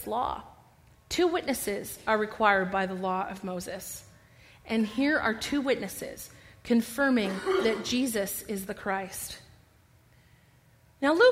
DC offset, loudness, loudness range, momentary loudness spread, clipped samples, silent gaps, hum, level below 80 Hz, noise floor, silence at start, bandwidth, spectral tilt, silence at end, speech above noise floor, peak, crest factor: under 0.1%; -29 LUFS; 3 LU; 14 LU; under 0.1%; none; none; -58 dBFS; -61 dBFS; 0 s; 16 kHz; -4 dB/octave; 0 s; 33 dB; -8 dBFS; 22 dB